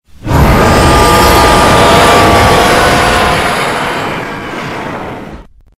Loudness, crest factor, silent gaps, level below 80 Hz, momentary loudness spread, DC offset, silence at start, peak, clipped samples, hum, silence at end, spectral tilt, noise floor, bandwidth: -7 LUFS; 8 dB; none; -20 dBFS; 14 LU; 1%; 0.2 s; 0 dBFS; 2%; none; 0.35 s; -4.5 dB/octave; -30 dBFS; 17 kHz